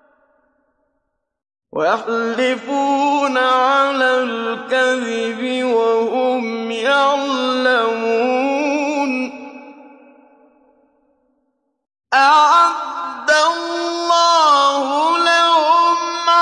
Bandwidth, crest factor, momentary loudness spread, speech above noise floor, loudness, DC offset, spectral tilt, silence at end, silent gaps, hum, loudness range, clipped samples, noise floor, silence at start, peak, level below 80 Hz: 11.5 kHz; 14 dB; 9 LU; 55 dB; -16 LUFS; under 0.1%; -2 dB/octave; 0 s; none; none; 8 LU; under 0.1%; -72 dBFS; 1.75 s; -2 dBFS; -74 dBFS